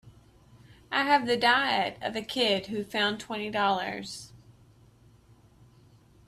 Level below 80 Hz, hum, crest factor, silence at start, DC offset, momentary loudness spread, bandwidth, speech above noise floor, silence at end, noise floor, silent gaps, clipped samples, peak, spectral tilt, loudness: -64 dBFS; none; 22 dB; 0.05 s; under 0.1%; 12 LU; 14 kHz; 30 dB; 1.9 s; -58 dBFS; none; under 0.1%; -8 dBFS; -3.5 dB/octave; -27 LUFS